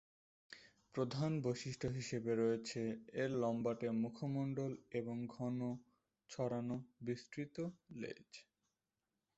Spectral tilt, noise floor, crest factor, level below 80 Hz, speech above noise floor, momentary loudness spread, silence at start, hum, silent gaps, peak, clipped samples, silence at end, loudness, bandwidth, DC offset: -6.5 dB/octave; under -90 dBFS; 16 dB; -74 dBFS; over 48 dB; 14 LU; 0.5 s; none; none; -26 dBFS; under 0.1%; 0.95 s; -42 LUFS; 8 kHz; under 0.1%